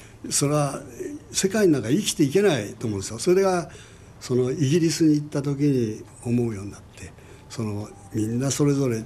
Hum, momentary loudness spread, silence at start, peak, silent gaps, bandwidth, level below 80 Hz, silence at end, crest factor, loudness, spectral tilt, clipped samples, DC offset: none; 16 LU; 0 s; -8 dBFS; none; 13 kHz; -54 dBFS; 0 s; 16 dB; -23 LUFS; -5.5 dB/octave; under 0.1%; under 0.1%